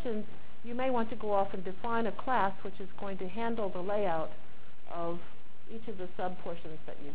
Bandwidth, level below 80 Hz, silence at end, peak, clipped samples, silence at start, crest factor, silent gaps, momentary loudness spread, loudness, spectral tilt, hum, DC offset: 4 kHz; -60 dBFS; 0 s; -16 dBFS; under 0.1%; 0 s; 20 dB; none; 15 LU; -36 LUFS; -9 dB/octave; none; 4%